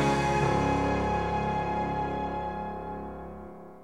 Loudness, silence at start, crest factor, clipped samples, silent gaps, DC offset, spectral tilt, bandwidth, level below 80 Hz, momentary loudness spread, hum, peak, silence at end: -29 LUFS; 0 s; 16 dB; under 0.1%; none; 0.3%; -6.5 dB/octave; 12.5 kHz; -42 dBFS; 16 LU; none; -14 dBFS; 0 s